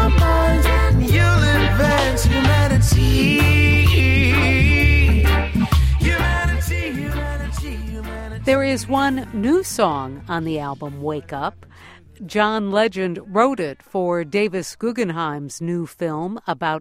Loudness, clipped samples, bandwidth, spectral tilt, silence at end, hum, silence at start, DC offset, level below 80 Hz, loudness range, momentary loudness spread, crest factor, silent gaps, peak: -18 LUFS; under 0.1%; 16.5 kHz; -6 dB/octave; 0 s; none; 0 s; under 0.1%; -24 dBFS; 8 LU; 12 LU; 16 dB; none; -2 dBFS